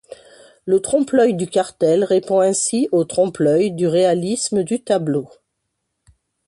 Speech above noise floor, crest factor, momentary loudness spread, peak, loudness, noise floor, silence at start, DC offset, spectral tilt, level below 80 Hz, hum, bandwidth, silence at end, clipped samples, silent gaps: 58 dB; 14 dB; 5 LU; -4 dBFS; -18 LUFS; -75 dBFS; 0.1 s; under 0.1%; -5 dB/octave; -60 dBFS; none; 11.5 kHz; 1.2 s; under 0.1%; none